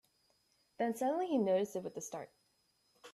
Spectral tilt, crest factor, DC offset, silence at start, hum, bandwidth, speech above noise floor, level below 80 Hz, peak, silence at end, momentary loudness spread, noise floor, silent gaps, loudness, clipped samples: -5.5 dB/octave; 16 dB; under 0.1%; 0.8 s; none; 14.5 kHz; 41 dB; -84 dBFS; -22 dBFS; 0.05 s; 14 LU; -76 dBFS; none; -36 LUFS; under 0.1%